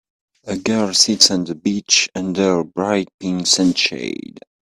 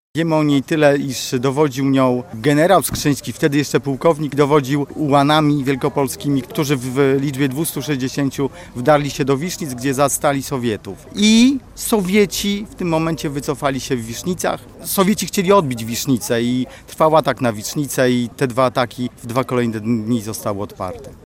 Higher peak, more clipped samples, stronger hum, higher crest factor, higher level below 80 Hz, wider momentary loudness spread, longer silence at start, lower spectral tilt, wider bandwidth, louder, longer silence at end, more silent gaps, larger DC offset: about the same, 0 dBFS vs -2 dBFS; neither; neither; about the same, 18 dB vs 16 dB; second, -58 dBFS vs -46 dBFS; first, 12 LU vs 9 LU; first, 0.45 s vs 0.15 s; second, -2.5 dB/octave vs -5 dB/octave; about the same, 16 kHz vs 16.5 kHz; about the same, -16 LUFS vs -18 LUFS; first, 0.5 s vs 0.1 s; first, 3.14-3.18 s vs none; neither